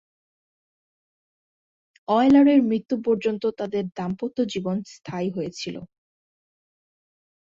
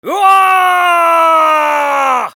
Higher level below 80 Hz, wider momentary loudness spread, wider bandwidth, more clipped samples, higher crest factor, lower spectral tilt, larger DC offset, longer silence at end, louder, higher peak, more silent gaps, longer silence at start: first, -62 dBFS vs -78 dBFS; first, 18 LU vs 4 LU; second, 7.6 kHz vs 20 kHz; neither; first, 18 dB vs 10 dB; first, -6.5 dB/octave vs -1 dB/octave; neither; first, 1.7 s vs 0.05 s; second, -23 LUFS vs -9 LUFS; second, -6 dBFS vs 0 dBFS; first, 2.85-2.89 s vs none; first, 2.1 s vs 0.05 s